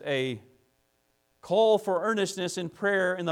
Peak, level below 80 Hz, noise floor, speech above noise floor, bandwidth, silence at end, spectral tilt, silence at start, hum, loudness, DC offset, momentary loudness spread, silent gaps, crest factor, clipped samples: -12 dBFS; -74 dBFS; -72 dBFS; 45 dB; 16 kHz; 0 s; -4.5 dB/octave; 0 s; none; -27 LUFS; under 0.1%; 10 LU; none; 16 dB; under 0.1%